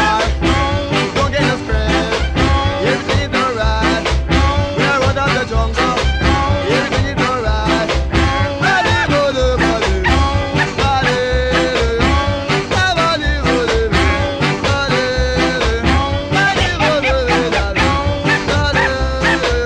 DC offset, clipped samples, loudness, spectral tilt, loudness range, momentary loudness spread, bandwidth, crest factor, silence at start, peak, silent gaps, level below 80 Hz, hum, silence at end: under 0.1%; under 0.1%; -15 LUFS; -5 dB/octave; 1 LU; 2 LU; 10.5 kHz; 14 dB; 0 s; 0 dBFS; none; -22 dBFS; none; 0 s